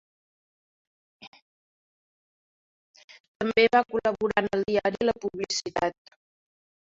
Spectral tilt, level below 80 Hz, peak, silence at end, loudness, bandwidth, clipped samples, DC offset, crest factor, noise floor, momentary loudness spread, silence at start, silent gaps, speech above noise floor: -3.5 dB/octave; -62 dBFS; -6 dBFS; 0.95 s; -26 LUFS; 7.8 kHz; under 0.1%; under 0.1%; 24 dB; under -90 dBFS; 9 LU; 1.2 s; 1.27-1.32 s, 1.42-2.94 s, 3.04-3.08 s, 3.20-3.40 s; over 65 dB